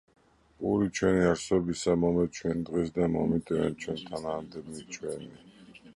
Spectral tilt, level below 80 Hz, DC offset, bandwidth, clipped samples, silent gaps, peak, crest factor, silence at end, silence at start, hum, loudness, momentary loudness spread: -6 dB/octave; -52 dBFS; under 0.1%; 11.5 kHz; under 0.1%; none; -12 dBFS; 18 dB; 0.05 s; 0.6 s; none; -29 LUFS; 13 LU